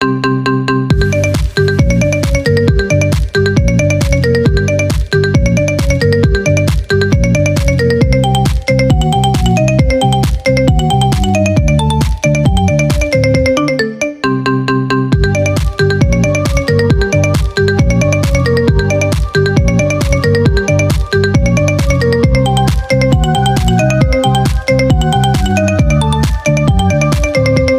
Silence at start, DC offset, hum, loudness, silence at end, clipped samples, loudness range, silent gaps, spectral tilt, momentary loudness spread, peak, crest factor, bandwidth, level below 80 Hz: 0 s; under 0.1%; none; -11 LUFS; 0 s; under 0.1%; 1 LU; none; -6 dB/octave; 2 LU; 0 dBFS; 10 dB; 15.5 kHz; -18 dBFS